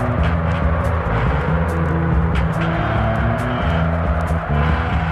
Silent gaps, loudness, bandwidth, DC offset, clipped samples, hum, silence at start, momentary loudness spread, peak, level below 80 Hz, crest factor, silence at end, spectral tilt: none; -19 LUFS; 10.5 kHz; under 0.1%; under 0.1%; none; 0 s; 2 LU; -6 dBFS; -24 dBFS; 12 dB; 0 s; -8 dB/octave